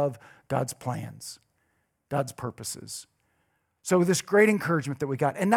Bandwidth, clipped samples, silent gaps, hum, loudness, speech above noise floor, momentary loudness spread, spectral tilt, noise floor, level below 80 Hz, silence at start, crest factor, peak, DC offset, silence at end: 17.5 kHz; under 0.1%; none; none; -27 LUFS; 47 dB; 18 LU; -5 dB/octave; -73 dBFS; -68 dBFS; 0 s; 22 dB; -6 dBFS; under 0.1%; 0 s